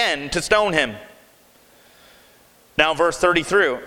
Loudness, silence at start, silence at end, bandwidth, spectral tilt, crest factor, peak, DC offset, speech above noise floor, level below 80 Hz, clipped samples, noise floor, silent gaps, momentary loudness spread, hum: -19 LUFS; 0 s; 0 s; 19.5 kHz; -3 dB/octave; 22 dB; 0 dBFS; under 0.1%; 34 dB; -46 dBFS; under 0.1%; -53 dBFS; none; 9 LU; none